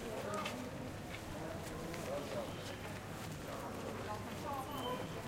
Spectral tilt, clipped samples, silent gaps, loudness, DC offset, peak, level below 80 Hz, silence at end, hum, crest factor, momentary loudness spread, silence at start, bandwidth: -5 dB/octave; under 0.1%; none; -44 LUFS; under 0.1%; -28 dBFS; -60 dBFS; 0 s; none; 16 dB; 5 LU; 0 s; 16 kHz